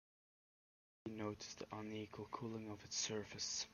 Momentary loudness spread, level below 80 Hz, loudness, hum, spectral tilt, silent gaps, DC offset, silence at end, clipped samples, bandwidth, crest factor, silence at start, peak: 8 LU; -78 dBFS; -47 LUFS; none; -3 dB/octave; none; under 0.1%; 0 s; under 0.1%; 15 kHz; 20 dB; 1.05 s; -30 dBFS